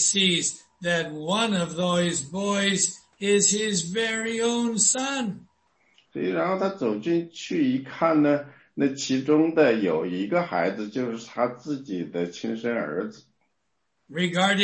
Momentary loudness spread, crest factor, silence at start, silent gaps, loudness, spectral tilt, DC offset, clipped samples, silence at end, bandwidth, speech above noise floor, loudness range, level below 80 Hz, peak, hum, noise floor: 11 LU; 18 dB; 0 s; none; -24 LUFS; -3.5 dB/octave; under 0.1%; under 0.1%; 0 s; 8.8 kHz; 53 dB; 6 LU; -66 dBFS; -8 dBFS; none; -77 dBFS